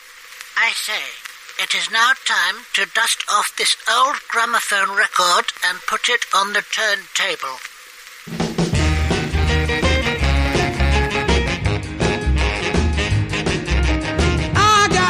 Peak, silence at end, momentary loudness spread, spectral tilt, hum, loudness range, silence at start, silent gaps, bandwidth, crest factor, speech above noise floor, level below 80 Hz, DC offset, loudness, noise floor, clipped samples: -4 dBFS; 0 s; 9 LU; -3.5 dB/octave; none; 3 LU; 0.05 s; none; 15.5 kHz; 14 dB; 21 dB; -26 dBFS; under 0.1%; -18 LUFS; -40 dBFS; under 0.1%